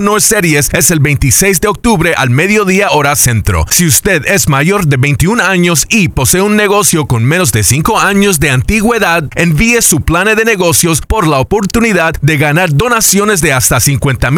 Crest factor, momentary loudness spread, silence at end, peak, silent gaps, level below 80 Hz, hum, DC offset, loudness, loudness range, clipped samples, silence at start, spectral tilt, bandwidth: 8 dB; 3 LU; 0 s; 0 dBFS; none; -24 dBFS; none; under 0.1%; -8 LUFS; 1 LU; 0.4%; 0 s; -4 dB/octave; over 20 kHz